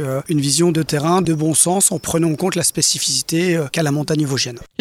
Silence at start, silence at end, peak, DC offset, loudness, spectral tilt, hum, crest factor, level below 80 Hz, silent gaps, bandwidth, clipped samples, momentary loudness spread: 0 s; 0.15 s; 0 dBFS; under 0.1%; -16 LUFS; -4 dB/octave; none; 16 dB; -50 dBFS; none; 16.5 kHz; under 0.1%; 5 LU